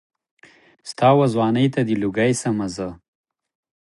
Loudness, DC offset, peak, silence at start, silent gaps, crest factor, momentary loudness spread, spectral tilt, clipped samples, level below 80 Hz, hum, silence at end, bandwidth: -19 LUFS; under 0.1%; -2 dBFS; 0.85 s; none; 18 dB; 16 LU; -6 dB/octave; under 0.1%; -56 dBFS; none; 0.9 s; 11.5 kHz